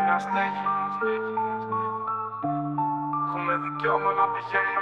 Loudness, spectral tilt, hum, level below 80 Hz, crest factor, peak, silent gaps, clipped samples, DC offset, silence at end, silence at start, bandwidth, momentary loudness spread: -27 LUFS; -7 dB/octave; none; -74 dBFS; 18 dB; -8 dBFS; none; under 0.1%; under 0.1%; 0 s; 0 s; 9.2 kHz; 5 LU